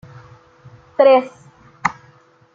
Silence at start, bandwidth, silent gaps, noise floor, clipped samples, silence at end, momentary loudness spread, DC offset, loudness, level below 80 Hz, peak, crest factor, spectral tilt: 1 s; 7.4 kHz; none; -51 dBFS; under 0.1%; 0.65 s; 17 LU; under 0.1%; -16 LUFS; -60 dBFS; 0 dBFS; 20 dB; -5.5 dB/octave